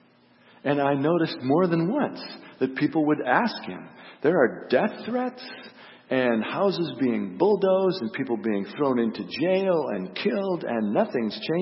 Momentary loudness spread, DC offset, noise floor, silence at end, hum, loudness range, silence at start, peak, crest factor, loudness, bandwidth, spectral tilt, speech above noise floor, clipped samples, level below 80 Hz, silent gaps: 10 LU; under 0.1%; -57 dBFS; 0 s; none; 1 LU; 0.65 s; -6 dBFS; 18 dB; -25 LUFS; 5.8 kHz; -10 dB/octave; 33 dB; under 0.1%; -72 dBFS; none